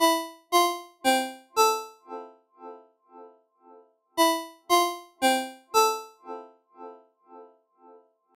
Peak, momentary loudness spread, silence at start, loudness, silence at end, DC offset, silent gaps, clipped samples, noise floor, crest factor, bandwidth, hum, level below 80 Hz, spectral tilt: -8 dBFS; 23 LU; 0 s; -25 LUFS; 0.95 s; under 0.1%; none; under 0.1%; -56 dBFS; 20 dB; 17 kHz; none; -76 dBFS; 0 dB/octave